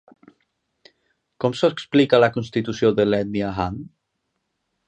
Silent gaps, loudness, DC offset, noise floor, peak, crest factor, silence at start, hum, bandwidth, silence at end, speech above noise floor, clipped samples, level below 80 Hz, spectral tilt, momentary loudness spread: none; -20 LUFS; under 0.1%; -76 dBFS; -2 dBFS; 20 dB; 1.4 s; none; 9.2 kHz; 1 s; 56 dB; under 0.1%; -50 dBFS; -6.5 dB/octave; 10 LU